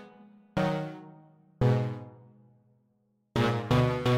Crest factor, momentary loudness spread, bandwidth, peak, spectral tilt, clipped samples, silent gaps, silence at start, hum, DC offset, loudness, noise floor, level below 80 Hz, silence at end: 18 dB; 16 LU; 11.5 kHz; -12 dBFS; -7.5 dB/octave; under 0.1%; none; 0 s; none; under 0.1%; -29 LUFS; -72 dBFS; -52 dBFS; 0 s